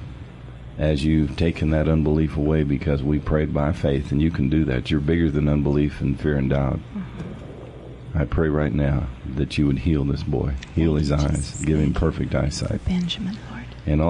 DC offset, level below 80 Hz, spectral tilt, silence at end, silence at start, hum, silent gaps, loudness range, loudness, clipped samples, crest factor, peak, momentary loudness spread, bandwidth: under 0.1%; -32 dBFS; -7.5 dB/octave; 0 s; 0 s; none; none; 3 LU; -22 LUFS; under 0.1%; 14 dB; -8 dBFS; 14 LU; 10.5 kHz